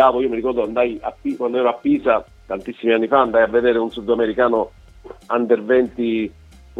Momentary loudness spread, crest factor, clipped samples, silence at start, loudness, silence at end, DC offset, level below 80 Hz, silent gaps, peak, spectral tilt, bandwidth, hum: 10 LU; 18 dB; under 0.1%; 0 s; -19 LUFS; 0 s; under 0.1%; -48 dBFS; none; 0 dBFS; -7 dB/octave; 6.6 kHz; none